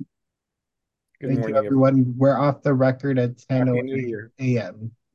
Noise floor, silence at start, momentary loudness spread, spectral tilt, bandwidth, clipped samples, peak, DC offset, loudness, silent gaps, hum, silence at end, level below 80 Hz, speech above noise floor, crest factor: -83 dBFS; 0 s; 10 LU; -9.5 dB/octave; 7 kHz; under 0.1%; -6 dBFS; under 0.1%; -21 LUFS; none; none; 0.25 s; -64 dBFS; 63 dB; 16 dB